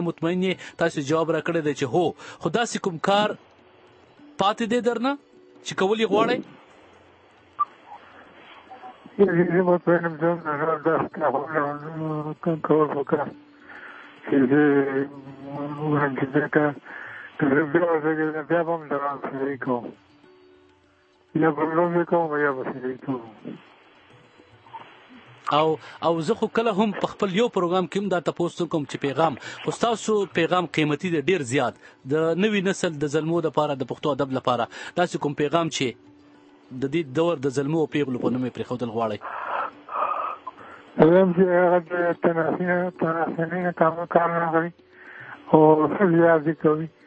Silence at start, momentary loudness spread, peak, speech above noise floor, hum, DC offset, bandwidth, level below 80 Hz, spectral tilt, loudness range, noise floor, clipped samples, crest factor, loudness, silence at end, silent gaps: 0 s; 13 LU; -2 dBFS; 37 dB; none; under 0.1%; 8.8 kHz; -66 dBFS; -6 dB/octave; 6 LU; -60 dBFS; under 0.1%; 22 dB; -23 LUFS; 0.2 s; none